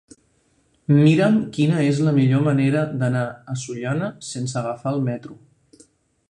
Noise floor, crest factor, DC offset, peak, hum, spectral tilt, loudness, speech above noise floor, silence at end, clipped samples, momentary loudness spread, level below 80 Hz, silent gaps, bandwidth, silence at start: -63 dBFS; 18 dB; under 0.1%; -4 dBFS; none; -7 dB/octave; -20 LUFS; 43 dB; 0.95 s; under 0.1%; 13 LU; -58 dBFS; none; 10.5 kHz; 0.9 s